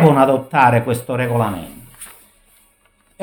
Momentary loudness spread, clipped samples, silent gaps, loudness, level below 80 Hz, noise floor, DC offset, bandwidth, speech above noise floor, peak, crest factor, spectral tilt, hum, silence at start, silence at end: 23 LU; under 0.1%; none; -16 LUFS; -52 dBFS; -58 dBFS; under 0.1%; 20 kHz; 43 dB; 0 dBFS; 18 dB; -7 dB/octave; none; 0 s; 1.15 s